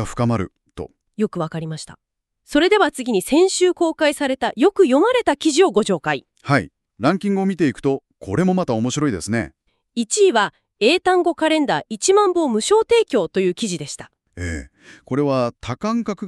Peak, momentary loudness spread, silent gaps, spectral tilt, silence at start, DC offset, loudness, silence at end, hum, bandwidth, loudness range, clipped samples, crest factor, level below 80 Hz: -4 dBFS; 13 LU; none; -4.5 dB/octave; 0 s; under 0.1%; -19 LUFS; 0 s; none; 13 kHz; 4 LU; under 0.1%; 16 dB; -48 dBFS